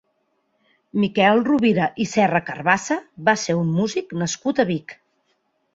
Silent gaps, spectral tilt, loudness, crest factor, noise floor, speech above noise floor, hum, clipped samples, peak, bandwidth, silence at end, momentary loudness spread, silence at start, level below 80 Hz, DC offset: none; -5 dB/octave; -20 LUFS; 20 dB; -69 dBFS; 49 dB; none; under 0.1%; -2 dBFS; 8 kHz; 0.8 s; 9 LU; 0.95 s; -62 dBFS; under 0.1%